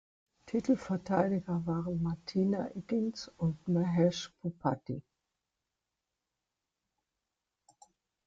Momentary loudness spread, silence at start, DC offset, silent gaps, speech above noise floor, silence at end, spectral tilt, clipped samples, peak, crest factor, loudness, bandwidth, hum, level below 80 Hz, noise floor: 8 LU; 0.45 s; under 0.1%; none; 56 dB; 3.25 s; -7.5 dB/octave; under 0.1%; -16 dBFS; 20 dB; -33 LUFS; 7.8 kHz; none; -64 dBFS; -88 dBFS